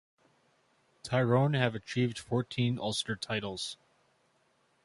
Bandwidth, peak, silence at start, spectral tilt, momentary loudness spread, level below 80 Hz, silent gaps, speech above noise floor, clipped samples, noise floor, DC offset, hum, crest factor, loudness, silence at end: 11.5 kHz; -12 dBFS; 1.05 s; -5.5 dB/octave; 12 LU; -66 dBFS; none; 40 dB; under 0.1%; -71 dBFS; under 0.1%; none; 22 dB; -32 LUFS; 1.1 s